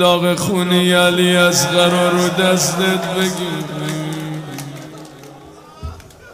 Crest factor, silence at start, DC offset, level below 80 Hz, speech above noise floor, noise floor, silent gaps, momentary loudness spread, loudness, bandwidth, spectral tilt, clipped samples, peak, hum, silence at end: 14 dB; 0 s; under 0.1%; -48 dBFS; 24 dB; -39 dBFS; none; 21 LU; -15 LUFS; 16 kHz; -4 dB/octave; under 0.1%; -2 dBFS; none; 0 s